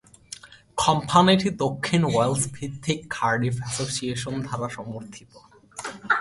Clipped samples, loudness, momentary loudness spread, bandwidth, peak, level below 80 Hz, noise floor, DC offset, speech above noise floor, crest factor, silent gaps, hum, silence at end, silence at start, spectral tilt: under 0.1%; -24 LUFS; 20 LU; 11.5 kHz; -4 dBFS; -54 dBFS; -45 dBFS; under 0.1%; 21 dB; 22 dB; none; none; 0 s; 0.3 s; -4.5 dB/octave